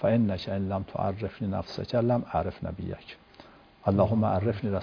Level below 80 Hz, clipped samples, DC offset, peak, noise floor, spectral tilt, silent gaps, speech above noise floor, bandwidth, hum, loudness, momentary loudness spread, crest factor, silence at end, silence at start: -52 dBFS; under 0.1%; under 0.1%; -10 dBFS; -53 dBFS; -9 dB/octave; none; 25 dB; 5.4 kHz; none; -29 LUFS; 13 LU; 18 dB; 0 s; 0 s